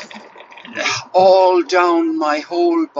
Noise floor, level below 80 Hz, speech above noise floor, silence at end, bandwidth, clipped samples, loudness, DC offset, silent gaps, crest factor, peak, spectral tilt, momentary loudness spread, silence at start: -39 dBFS; -66 dBFS; 25 dB; 0 s; 7.8 kHz; under 0.1%; -15 LUFS; under 0.1%; none; 14 dB; -2 dBFS; -3.5 dB/octave; 10 LU; 0 s